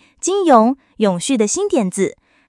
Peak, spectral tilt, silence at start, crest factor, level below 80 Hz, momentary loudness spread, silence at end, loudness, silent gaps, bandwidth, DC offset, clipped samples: 0 dBFS; -4.5 dB/octave; 0.25 s; 16 dB; -60 dBFS; 8 LU; 0.4 s; -16 LUFS; none; 12 kHz; under 0.1%; under 0.1%